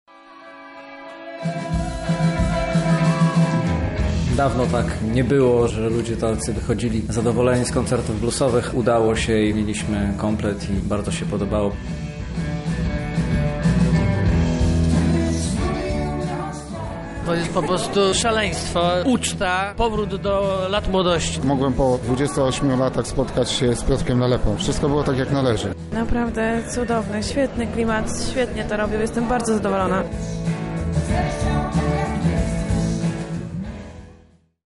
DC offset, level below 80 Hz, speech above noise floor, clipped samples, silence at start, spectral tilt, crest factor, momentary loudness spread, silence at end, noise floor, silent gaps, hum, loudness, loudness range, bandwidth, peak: under 0.1%; -32 dBFS; 32 dB; under 0.1%; 0.15 s; -6 dB/octave; 12 dB; 8 LU; 0.5 s; -53 dBFS; none; none; -21 LUFS; 3 LU; 11.5 kHz; -8 dBFS